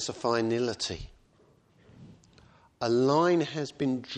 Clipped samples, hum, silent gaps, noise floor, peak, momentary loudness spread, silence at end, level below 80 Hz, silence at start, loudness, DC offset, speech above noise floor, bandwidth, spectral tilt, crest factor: under 0.1%; none; none; -63 dBFS; -12 dBFS; 11 LU; 0 s; -58 dBFS; 0 s; -28 LUFS; under 0.1%; 35 dB; 9.6 kHz; -5 dB/octave; 18 dB